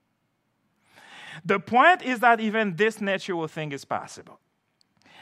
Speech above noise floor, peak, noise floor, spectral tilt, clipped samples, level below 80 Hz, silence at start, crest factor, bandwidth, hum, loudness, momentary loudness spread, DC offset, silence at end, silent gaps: 50 dB; -4 dBFS; -73 dBFS; -5 dB/octave; under 0.1%; -80 dBFS; 1.1 s; 22 dB; 15 kHz; none; -23 LUFS; 19 LU; under 0.1%; 1 s; none